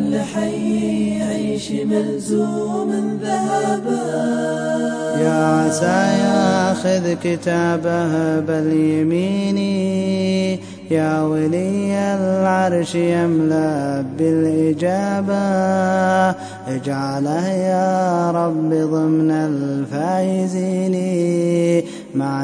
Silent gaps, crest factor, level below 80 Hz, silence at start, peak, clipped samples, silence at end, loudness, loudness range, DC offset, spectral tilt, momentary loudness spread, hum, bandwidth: none; 14 dB; -60 dBFS; 0 s; -4 dBFS; under 0.1%; 0 s; -18 LUFS; 3 LU; under 0.1%; -6.5 dB/octave; 5 LU; none; 10.5 kHz